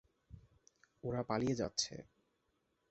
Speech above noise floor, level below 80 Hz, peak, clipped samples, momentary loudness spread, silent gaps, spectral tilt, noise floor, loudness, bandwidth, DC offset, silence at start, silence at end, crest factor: 43 dB; -66 dBFS; -20 dBFS; under 0.1%; 16 LU; none; -5 dB/octave; -81 dBFS; -39 LUFS; 8 kHz; under 0.1%; 0.3 s; 0.85 s; 22 dB